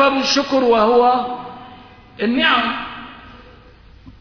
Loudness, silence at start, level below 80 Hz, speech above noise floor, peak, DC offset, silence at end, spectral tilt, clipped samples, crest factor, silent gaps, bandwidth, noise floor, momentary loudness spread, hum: -16 LUFS; 0 s; -48 dBFS; 28 dB; -4 dBFS; under 0.1%; 0.1 s; -3 dB/octave; under 0.1%; 16 dB; none; 5.4 kHz; -44 dBFS; 21 LU; none